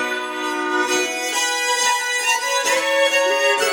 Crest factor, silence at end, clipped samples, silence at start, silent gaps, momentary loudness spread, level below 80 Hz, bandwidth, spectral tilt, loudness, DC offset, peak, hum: 16 dB; 0 s; under 0.1%; 0 s; none; 6 LU; -78 dBFS; 19 kHz; 1 dB/octave; -18 LUFS; under 0.1%; -4 dBFS; none